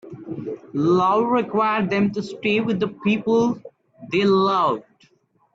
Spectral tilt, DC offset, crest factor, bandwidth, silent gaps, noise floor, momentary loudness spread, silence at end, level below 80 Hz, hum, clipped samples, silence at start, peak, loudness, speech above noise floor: -7 dB/octave; under 0.1%; 14 dB; 7.8 kHz; none; -61 dBFS; 13 LU; 0.75 s; -60 dBFS; none; under 0.1%; 0.05 s; -8 dBFS; -21 LUFS; 42 dB